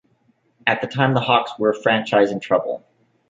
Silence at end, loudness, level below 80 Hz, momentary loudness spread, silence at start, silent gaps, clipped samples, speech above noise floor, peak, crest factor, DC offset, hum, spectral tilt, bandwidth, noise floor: 0.5 s; -19 LUFS; -64 dBFS; 6 LU; 0.65 s; none; under 0.1%; 44 dB; -2 dBFS; 18 dB; under 0.1%; none; -6.5 dB/octave; 7.8 kHz; -62 dBFS